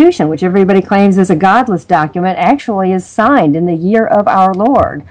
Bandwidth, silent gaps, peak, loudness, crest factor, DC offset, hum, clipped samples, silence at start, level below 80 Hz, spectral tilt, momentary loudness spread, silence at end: 9.4 kHz; none; 0 dBFS; -10 LUFS; 10 dB; under 0.1%; none; 1%; 0 s; -44 dBFS; -7.5 dB/octave; 4 LU; 0.1 s